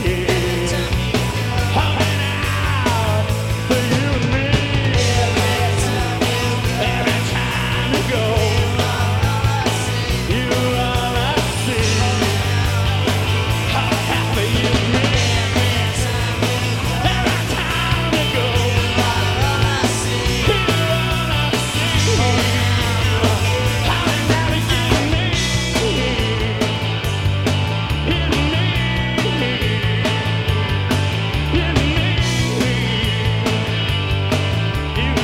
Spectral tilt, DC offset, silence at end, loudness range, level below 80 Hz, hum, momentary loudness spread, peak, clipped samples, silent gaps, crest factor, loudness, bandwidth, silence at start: -4.5 dB/octave; under 0.1%; 0 s; 2 LU; -28 dBFS; none; 3 LU; -2 dBFS; under 0.1%; none; 14 dB; -18 LUFS; 16.5 kHz; 0 s